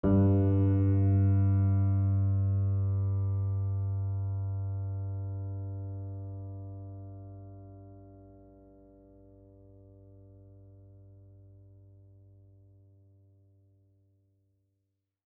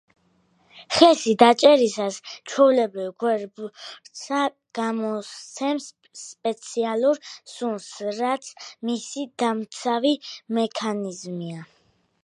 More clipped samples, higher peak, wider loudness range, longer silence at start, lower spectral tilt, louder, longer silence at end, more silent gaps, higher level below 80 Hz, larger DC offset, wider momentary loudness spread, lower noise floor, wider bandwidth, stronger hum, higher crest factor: neither; second, -16 dBFS vs 0 dBFS; first, 23 LU vs 9 LU; second, 0.05 s vs 0.75 s; first, -13 dB/octave vs -4 dB/octave; second, -30 LUFS vs -23 LUFS; first, 6.95 s vs 0.6 s; neither; first, -58 dBFS vs -70 dBFS; neither; about the same, 21 LU vs 20 LU; first, -82 dBFS vs -64 dBFS; second, 2.3 kHz vs 11 kHz; neither; second, 16 dB vs 22 dB